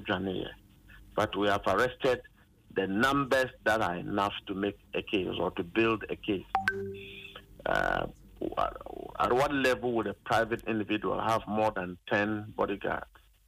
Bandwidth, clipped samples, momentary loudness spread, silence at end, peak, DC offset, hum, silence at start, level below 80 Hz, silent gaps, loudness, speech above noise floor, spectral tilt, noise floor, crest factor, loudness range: 15.5 kHz; under 0.1%; 11 LU; 0.45 s; -12 dBFS; under 0.1%; none; 0 s; -54 dBFS; none; -31 LUFS; 24 dB; -5.5 dB/octave; -55 dBFS; 18 dB; 3 LU